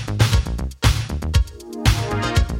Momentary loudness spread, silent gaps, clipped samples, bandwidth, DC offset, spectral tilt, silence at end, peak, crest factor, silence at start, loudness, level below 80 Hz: 5 LU; none; under 0.1%; 16.5 kHz; under 0.1%; -5 dB/octave; 0 s; -2 dBFS; 18 dB; 0 s; -21 LUFS; -24 dBFS